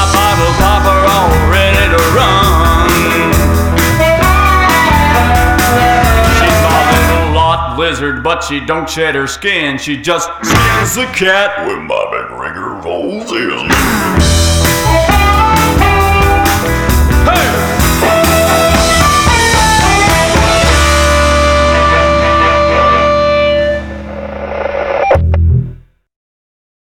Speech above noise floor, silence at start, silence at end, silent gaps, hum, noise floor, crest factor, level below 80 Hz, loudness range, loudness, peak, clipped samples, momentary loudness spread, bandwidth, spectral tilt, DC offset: 17 dB; 0 s; 1.05 s; none; none; -30 dBFS; 10 dB; -18 dBFS; 5 LU; -9 LUFS; 0 dBFS; under 0.1%; 8 LU; over 20 kHz; -4.5 dB/octave; under 0.1%